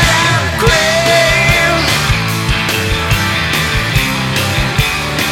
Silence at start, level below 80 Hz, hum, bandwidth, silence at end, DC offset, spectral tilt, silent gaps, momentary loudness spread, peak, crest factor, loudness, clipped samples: 0 s; -24 dBFS; none; 19 kHz; 0 s; under 0.1%; -3.5 dB/octave; none; 5 LU; 0 dBFS; 12 dB; -12 LUFS; under 0.1%